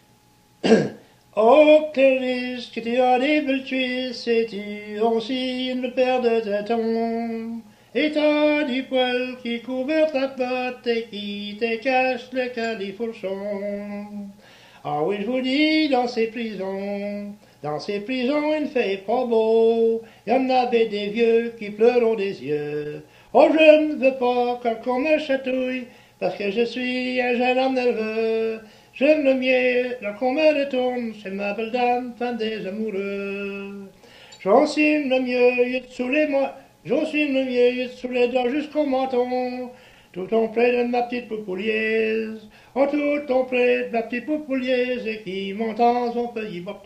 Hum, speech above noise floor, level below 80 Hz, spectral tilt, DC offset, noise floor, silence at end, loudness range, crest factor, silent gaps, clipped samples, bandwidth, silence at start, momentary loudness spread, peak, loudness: none; 35 dB; -62 dBFS; -5.5 dB/octave; under 0.1%; -57 dBFS; 0.05 s; 6 LU; 22 dB; none; under 0.1%; 9.2 kHz; 0.65 s; 12 LU; 0 dBFS; -22 LUFS